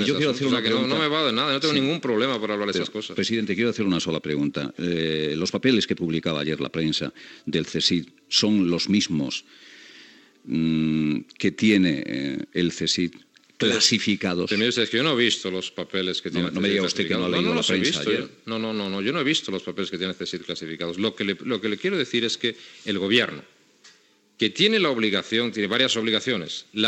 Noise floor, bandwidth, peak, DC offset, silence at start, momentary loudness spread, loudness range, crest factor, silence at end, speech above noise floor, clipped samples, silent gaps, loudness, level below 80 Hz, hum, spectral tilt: -58 dBFS; 9 kHz; -4 dBFS; under 0.1%; 0 s; 9 LU; 4 LU; 20 dB; 0 s; 34 dB; under 0.1%; none; -23 LUFS; -64 dBFS; none; -4 dB/octave